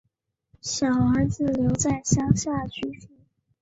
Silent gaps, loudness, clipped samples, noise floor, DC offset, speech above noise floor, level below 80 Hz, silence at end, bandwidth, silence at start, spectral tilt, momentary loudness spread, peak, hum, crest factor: none; -24 LUFS; under 0.1%; -72 dBFS; under 0.1%; 48 dB; -44 dBFS; 0.55 s; 8 kHz; 0.65 s; -5.5 dB/octave; 12 LU; -4 dBFS; none; 20 dB